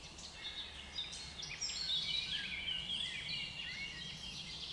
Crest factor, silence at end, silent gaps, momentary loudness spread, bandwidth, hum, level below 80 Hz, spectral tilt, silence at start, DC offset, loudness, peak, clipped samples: 16 dB; 0 s; none; 9 LU; 11.5 kHz; none; -62 dBFS; -1 dB/octave; 0 s; under 0.1%; -40 LUFS; -26 dBFS; under 0.1%